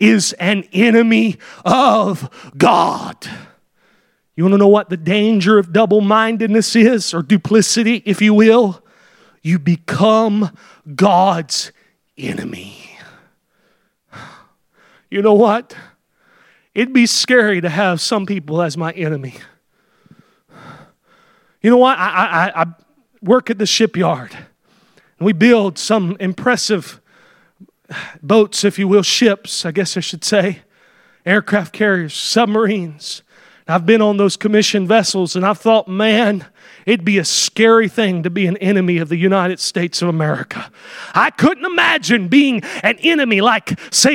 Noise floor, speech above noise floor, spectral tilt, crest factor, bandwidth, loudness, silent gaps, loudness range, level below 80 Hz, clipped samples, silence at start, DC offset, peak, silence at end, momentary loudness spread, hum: -61 dBFS; 47 dB; -4.5 dB/octave; 16 dB; 16 kHz; -14 LUFS; none; 6 LU; -62 dBFS; under 0.1%; 0 s; under 0.1%; 0 dBFS; 0 s; 14 LU; none